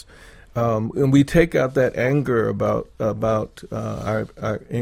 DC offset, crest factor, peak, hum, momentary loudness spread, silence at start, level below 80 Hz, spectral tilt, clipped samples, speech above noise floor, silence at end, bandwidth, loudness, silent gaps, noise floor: under 0.1%; 20 dB; -2 dBFS; none; 11 LU; 0.2 s; -42 dBFS; -7.5 dB/octave; under 0.1%; 25 dB; 0 s; 16 kHz; -21 LUFS; none; -46 dBFS